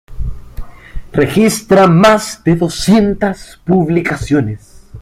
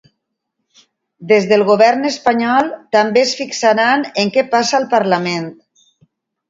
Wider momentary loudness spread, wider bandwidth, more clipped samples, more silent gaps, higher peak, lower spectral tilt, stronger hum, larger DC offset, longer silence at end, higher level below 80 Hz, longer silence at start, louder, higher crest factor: first, 18 LU vs 5 LU; first, 15.5 kHz vs 7.8 kHz; neither; neither; about the same, 0 dBFS vs 0 dBFS; first, -6 dB/octave vs -4 dB/octave; neither; neither; second, 0 s vs 0.95 s; first, -30 dBFS vs -64 dBFS; second, 0.1 s vs 1.2 s; about the same, -12 LUFS vs -14 LUFS; about the same, 12 dB vs 16 dB